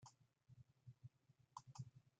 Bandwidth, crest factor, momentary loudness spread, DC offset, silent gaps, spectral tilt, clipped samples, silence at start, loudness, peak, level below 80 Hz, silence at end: 9 kHz; 24 dB; 9 LU; under 0.1%; none; -5 dB/octave; under 0.1%; 0 s; -63 LUFS; -40 dBFS; -86 dBFS; 0.1 s